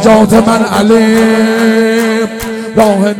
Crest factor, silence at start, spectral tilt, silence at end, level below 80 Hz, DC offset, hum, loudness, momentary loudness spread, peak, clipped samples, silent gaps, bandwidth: 8 dB; 0 s; -5.5 dB/octave; 0 s; -38 dBFS; under 0.1%; none; -9 LUFS; 8 LU; 0 dBFS; 4%; none; 16.5 kHz